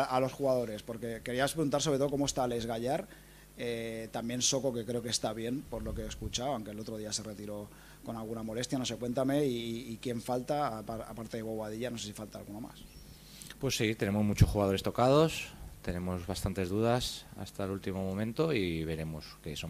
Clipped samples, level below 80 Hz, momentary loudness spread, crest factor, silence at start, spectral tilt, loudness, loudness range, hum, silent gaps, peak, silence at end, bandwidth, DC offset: under 0.1%; -50 dBFS; 15 LU; 24 dB; 0 s; -5 dB/octave; -34 LUFS; 7 LU; none; none; -10 dBFS; 0 s; 15 kHz; under 0.1%